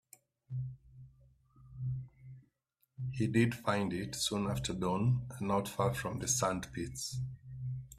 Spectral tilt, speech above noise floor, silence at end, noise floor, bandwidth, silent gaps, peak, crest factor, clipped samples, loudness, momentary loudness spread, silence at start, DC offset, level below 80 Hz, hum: -5 dB/octave; 45 dB; 0 s; -79 dBFS; 15 kHz; none; -16 dBFS; 20 dB; under 0.1%; -36 LUFS; 13 LU; 0.5 s; under 0.1%; -58 dBFS; none